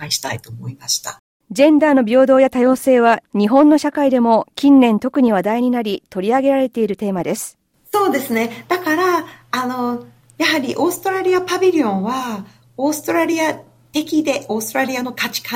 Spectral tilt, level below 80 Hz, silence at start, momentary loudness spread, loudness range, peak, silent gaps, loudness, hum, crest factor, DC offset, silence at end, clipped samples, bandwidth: -4.5 dB/octave; -60 dBFS; 0 s; 12 LU; 6 LU; -2 dBFS; 1.19-1.40 s; -16 LUFS; none; 14 dB; under 0.1%; 0 s; under 0.1%; 16.5 kHz